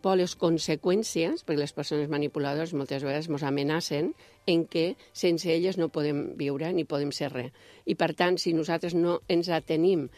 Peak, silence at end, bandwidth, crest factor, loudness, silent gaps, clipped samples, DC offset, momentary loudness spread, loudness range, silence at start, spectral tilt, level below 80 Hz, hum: -8 dBFS; 0.1 s; 14.5 kHz; 20 dB; -28 LUFS; none; under 0.1%; under 0.1%; 6 LU; 1 LU; 0.05 s; -5.5 dB/octave; -66 dBFS; none